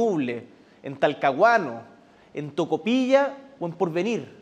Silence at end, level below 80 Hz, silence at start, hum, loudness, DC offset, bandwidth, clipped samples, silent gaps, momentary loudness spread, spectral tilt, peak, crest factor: 0.1 s; -76 dBFS; 0 s; none; -24 LUFS; under 0.1%; 8.8 kHz; under 0.1%; none; 18 LU; -6 dB/octave; -6 dBFS; 18 dB